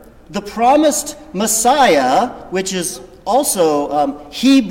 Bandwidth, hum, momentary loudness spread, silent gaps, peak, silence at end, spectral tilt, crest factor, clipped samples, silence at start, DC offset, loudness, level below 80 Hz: 17 kHz; none; 13 LU; none; -2 dBFS; 0 s; -3 dB/octave; 12 dB; under 0.1%; 0.3 s; under 0.1%; -15 LUFS; -46 dBFS